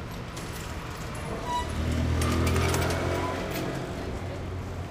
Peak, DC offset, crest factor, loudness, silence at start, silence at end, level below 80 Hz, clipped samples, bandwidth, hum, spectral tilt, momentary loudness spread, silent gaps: -14 dBFS; under 0.1%; 16 dB; -30 LUFS; 0 s; 0 s; -38 dBFS; under 0.1%; 16 kHz; none; -5.5 dB/octave; 11 LU; none